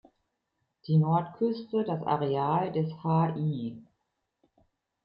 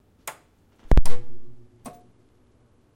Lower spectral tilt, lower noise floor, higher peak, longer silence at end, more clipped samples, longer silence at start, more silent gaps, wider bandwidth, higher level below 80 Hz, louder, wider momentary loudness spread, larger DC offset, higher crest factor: first, -11.5 dB/octave vs -6 dB/octave; first, -80 dBFS vs -60 dBFS; second, -14 dBFS vs -4 dBFS; second, 1.2 s vs 1.4 s; neither; first, 0.85 s vs 0.25 s; neither; second, 5.4 kHz vs 14 kHz; second, -70 dBFS vs -26 dBFS; about the same, -29 LUFS vs -27 LUFS; second, 7 LU vs 26 LU; neither; about the same, 16 dB vs 14 dB